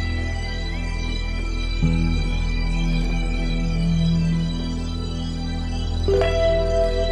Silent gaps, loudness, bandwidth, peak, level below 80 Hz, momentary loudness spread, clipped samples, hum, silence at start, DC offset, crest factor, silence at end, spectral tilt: none; -24 LUFS; 9.4 kHz; -6 dBFS; -24 dBFS; 8 LU; under 0.1%; none; 0 s; under 0.1%; 14 dB; 0 s; -6.5 dB/octave